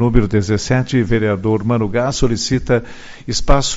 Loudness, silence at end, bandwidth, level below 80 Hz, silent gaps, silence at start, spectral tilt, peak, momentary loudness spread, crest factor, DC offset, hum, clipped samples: -17 LUFS; 0 s; 8 kHz; -24 dBFS; none; 0 s; -5.5 dB/octave; 0 dBFS; 5 LU; 16 dB; under 0.1%; none; under 0.1%